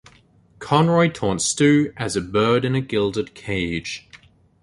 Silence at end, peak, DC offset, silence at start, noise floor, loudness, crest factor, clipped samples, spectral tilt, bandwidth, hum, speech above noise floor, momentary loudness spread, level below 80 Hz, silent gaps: 0.45 s; -2 dBFS; under 0.1%; 0.6 s; -54 dBFS; -20 LUFS; 18 dB; under 0.1%; -5 dB/octave; 11.5 kHz; none; 34 dB; 11 LU; -48 dBFS; none